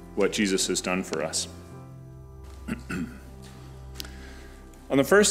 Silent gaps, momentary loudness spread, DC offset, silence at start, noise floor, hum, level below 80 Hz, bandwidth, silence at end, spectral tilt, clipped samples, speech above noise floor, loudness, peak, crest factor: none; 22 LU; under 0.1%; 0 s; -45 dBFS; none; -48 dBFS; 16 kHz; 0 s; -3.5 dB/octave; under 0.1%; 20 dB; -26 LUFS; -8 dBFS; 20 dB